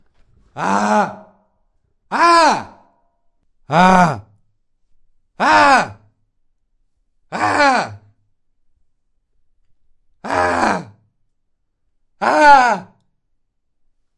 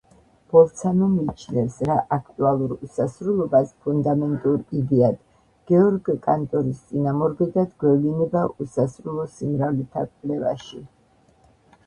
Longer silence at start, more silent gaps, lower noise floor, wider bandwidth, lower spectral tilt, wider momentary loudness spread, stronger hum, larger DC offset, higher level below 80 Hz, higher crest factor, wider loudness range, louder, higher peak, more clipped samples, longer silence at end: about the same, 0.55 s vs 0.5 s; neither; first, -66 dBFS vs -58 dBFS; about the same, 11.5 kHz vs 10.5 kHz; second, -4.5 dB/octave vs -9 dB/octave; first, 14 LU vs 9 LU; neither; neither; about the same, -50 dBFS vs -54 dBFS; about the same, 18 dB vs 20 dB; first, 8 LU vs 3 LU; first, -14 LUFS vs -22 LUFS; about the same, 0 dBFS vs -2 dBFS; neither; first, 1.35 s vs 1 s